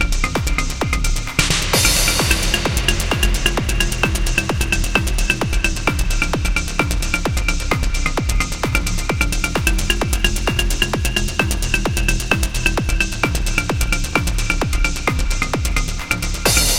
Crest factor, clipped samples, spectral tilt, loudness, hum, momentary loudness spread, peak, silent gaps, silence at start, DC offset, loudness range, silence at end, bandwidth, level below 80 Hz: 18 dB; under 0.1%; -3 dB/octave; -18 LUFS; none; 5 LU; 0 dBFS; none; 0 s; under 0.1%; 3 LU; 0 s; 17 kHz; -20 dBFS